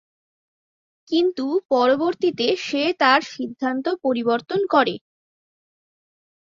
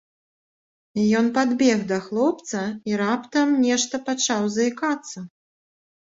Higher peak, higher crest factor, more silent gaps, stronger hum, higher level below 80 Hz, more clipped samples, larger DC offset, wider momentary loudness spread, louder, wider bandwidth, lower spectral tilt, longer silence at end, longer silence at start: about the same, -4 dBFS vs -6 dBFS; about the same, 18 dB vs 16 dB; first, 1.65-1.69 s vs none; neither; about the same, -68 dBFS vs -66 dBFS; neither; neither; about the same, 7 LU vs 9 LU; about the same, -21 LUFS vs -22 LUFS; about the same, 7.6 kHz vs 8 kHz; about the same, -4.5 dB/octave vs -4 dB/octave; first, 1.5 s vs 0.9 s; first, 1.1 s vs 0.95 s